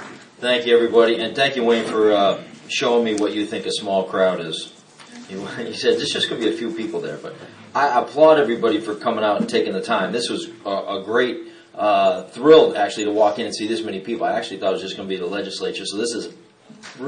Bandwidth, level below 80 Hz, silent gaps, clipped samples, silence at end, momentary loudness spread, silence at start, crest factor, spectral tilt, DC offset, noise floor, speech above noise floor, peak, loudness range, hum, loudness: 10.5 kHz; -68 dBFS; none; under 0.1%; 0 s; 14 LU; 0 s; 20 dB; -4 dB/octave; under 0.1%; -43 dBFS; 24 dB; 0 dBFS; 5 LU; none; -20 LUFS